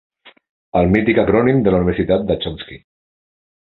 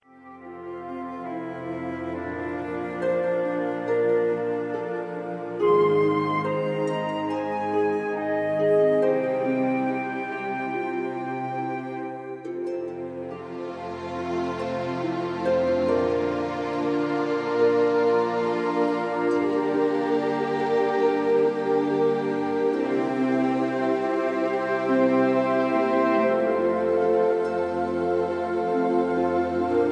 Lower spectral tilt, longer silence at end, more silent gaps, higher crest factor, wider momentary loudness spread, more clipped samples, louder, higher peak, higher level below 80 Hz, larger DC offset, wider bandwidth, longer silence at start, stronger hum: first, -10 dB/octave vs -7.5 dB/octave; first, 0.95 s vs 0 s; first, 0.49-0.72 s vs none; about the same, 18 dB vs 14 dB; about the same, 11 LU vs 11 LU; neither; first, -16 LUFS vs -25 LUFS; first, 0 dBFS vs -10 dBFS; first, -36 dBFS vs -62 dBFS; neither; second, 4.3 kHz vs 9.8 kHz; about the same, 0.25 s vs 0.15 s; neither